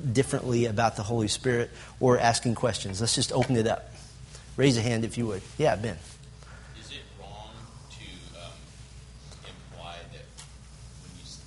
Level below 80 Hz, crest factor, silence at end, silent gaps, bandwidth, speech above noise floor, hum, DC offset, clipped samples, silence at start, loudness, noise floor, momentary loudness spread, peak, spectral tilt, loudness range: -50 dBFS; 22 dB; 0 s; none; 11.5 kHz; 21 dB; none; under 0.1%; under 0.1%; 0 s; -27 LUFS; -47 dBFS; 23 LU; -6 dBFS; -5 dB/octave; 19 LU